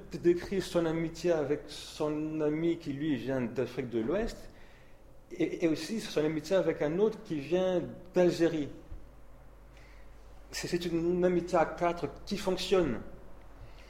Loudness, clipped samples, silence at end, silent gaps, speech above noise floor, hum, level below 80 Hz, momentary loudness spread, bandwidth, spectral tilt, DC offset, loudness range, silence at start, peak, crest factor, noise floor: -32 LUFS; under 0.1%; 0 s; none; 22 dB; none; -52 dBFS; 10 LU; 15.5 kHz; -6 dB/octave; under 0.1%; 4 LU; 0 s; -14 dBFS; 18 dB; -53 dBFS